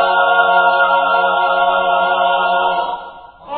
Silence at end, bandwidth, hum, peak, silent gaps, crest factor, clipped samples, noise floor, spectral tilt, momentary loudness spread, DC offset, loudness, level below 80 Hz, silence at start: 0 s; 4.5 kHz; none; 0 dBFS; none; 14 dB; under 0.1%; -34 dBFS; -6 dB/octave; 6 LU; under 0.1%; -14 LUFS; -54 dBFS; 0 s